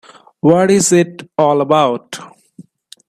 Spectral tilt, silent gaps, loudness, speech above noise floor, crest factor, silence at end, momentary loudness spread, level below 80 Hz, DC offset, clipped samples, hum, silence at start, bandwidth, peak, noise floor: -5 dB/octave; none; -13 LUFS; 30 dB; 14 dB; 0.8 s; 14 LU; -58 dBFS; under 0.1%; under 0.1%; none; 0.45 s; 14.5 kHz; 0 dBFS; -43 dBFS